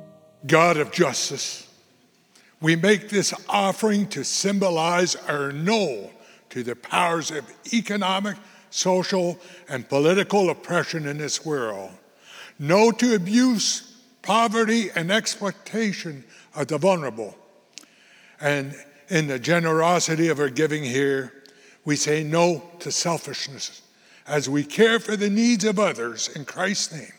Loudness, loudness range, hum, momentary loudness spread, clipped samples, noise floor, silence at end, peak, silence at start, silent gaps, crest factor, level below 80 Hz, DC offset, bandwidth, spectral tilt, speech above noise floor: -22 LUFS; 4 LU; none; 14 LU; under 0.1%; -60 dBFS; 0.05 s; 0 dBFS; 0 s; none; 22 dB; -80 dBFS; under 0.1%; over 20 kHz; -4 dB/octave; 37 dB